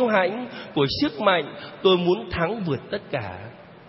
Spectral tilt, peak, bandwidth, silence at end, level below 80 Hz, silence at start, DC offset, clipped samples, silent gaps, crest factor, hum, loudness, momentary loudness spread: -9.5 dB/octave; -6 dBFS; 5.8 kHz; 0 s; -52 dBFS; 0 s; under 0.1%; under 0.1%; none; 18 dB; none; -24 LUFS; 14 LU